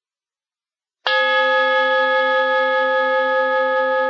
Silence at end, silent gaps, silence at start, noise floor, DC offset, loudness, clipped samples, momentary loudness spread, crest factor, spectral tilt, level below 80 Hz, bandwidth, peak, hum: 0 s; none; 1.05 s; under -90 dBFS; under 0.1%; -17 LUFS; under 0.1%; 2 LU; 14 dB; -1 dB/octave; under -90 dBFS; 6.6 kHz; -4 dBFS; none